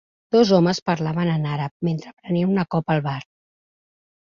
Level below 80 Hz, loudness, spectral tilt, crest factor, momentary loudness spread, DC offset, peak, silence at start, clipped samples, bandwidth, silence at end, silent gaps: -58 dBFS; -21 LUFS; -7 dB/octave; 18 dB; 10 LU; under 0.1%; -4 dBFS; 0.3 s; under 0.1%; 7.4 kHz; 1 s; 0.82-0.86 s, 1.71-1.80 s, 2.13-2.17 s